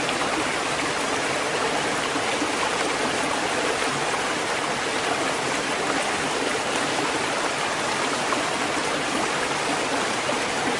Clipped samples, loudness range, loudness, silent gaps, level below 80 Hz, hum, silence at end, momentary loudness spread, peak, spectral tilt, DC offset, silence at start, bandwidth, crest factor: under 0.1%; 0 LU; -24 LUFS; none; -56 dBFS; none; 0 s; 1 LU; -10 dBFS; -2 dB/octave; under 0.1%; 0 s; 11.5 kHz; 14 dB